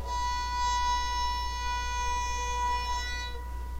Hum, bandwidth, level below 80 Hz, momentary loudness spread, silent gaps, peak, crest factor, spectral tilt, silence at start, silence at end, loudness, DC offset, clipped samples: none; 16 kHz; -36 dBFS; 6 LU; none; -18 dBFS; 12 dB; -2 dB/octave; 0 s; 0 s; -31 LUFS; 0.1%; under 0.1%